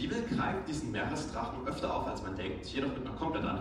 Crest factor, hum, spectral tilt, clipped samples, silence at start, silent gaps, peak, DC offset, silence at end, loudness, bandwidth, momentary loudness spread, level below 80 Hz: 14 dB; none; -5.5 dB/octave; under 0.1%; 0 s; none; -22 dBFS; under 0.1%; 0 s; -36 LUFS; 11 kHz; 5 LU; -50 dBFS